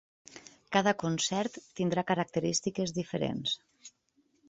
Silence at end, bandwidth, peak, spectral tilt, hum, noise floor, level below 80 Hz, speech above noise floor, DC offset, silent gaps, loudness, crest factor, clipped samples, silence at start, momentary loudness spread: 0.6 s; 8.4 kHz; -12 dBFS; -4 dB/octave; none; -72 dBFS; -68 dBFS; 40 dB; under 0.1%; none; -31 LUFS; 22 dB; under 0.1%; 0.3 s; 15 LU